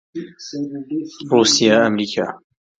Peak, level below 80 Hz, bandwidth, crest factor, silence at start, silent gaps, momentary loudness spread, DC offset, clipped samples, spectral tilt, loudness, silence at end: 0 dBFS; -64 dBFS; 9.4 kHz; 18 dB; 0.15 s; none; 18 LU; under 0.1%; under 0.1%; -3.5 dB/octave; -17 LUFS; 0.4 s